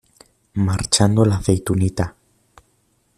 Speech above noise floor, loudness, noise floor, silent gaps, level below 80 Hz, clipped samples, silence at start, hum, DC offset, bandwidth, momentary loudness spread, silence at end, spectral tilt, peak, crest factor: 46 dB; -19 LUFS; -63 dBFS; none; -42 dBFS; under 0.1%; 0.55 s; none; under 0.1%; 14 kHz; 11 LU; 1.1 s; -5 dB/octave; -2 dBFS; 18 dB